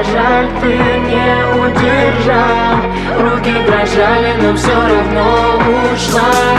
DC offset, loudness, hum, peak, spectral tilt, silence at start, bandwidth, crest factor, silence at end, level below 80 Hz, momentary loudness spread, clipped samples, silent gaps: under 0.1%; -11 LUFS; none; 0 dBFS; -5.5 dB/octave; 0 s; 14 kHz; 10 dB; 0 s; -26 dBFS; 2 LU; under 0.1%; none